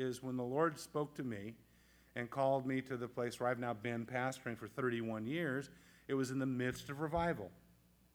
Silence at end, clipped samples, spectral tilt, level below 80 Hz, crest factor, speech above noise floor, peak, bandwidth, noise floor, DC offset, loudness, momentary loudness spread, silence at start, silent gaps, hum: 0.6 s; under 0.1%; -6 dB/octave; -66 dBFS; 18 dB; 29 dB; -22 dBFS; 19.5 kHz; -69 dBFS; under 0.1%; -40 LUFS; 9 LU; 0 s; none; none